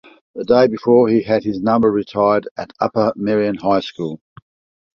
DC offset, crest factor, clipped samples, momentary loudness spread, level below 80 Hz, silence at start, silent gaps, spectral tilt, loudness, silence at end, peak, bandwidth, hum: under 0.1%; 16 dB; under 0.1%; 14 LU; -54 dBFS; 0.35 s; 2.51-2.56 s; -8 dB/octave; -17 LUFS; 0.8 s; -2 dBFS; 6.8 kHz; none